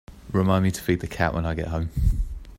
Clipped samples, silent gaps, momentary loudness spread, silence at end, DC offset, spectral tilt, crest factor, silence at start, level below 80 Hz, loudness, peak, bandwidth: under 0.1%; none; 7 LU; 0 s; under 0.1%; -6.5 dB/octave; 18 dB; 0.1 s; -30 dBFS; -25 LUFS; -6 dBFS; 16 kHz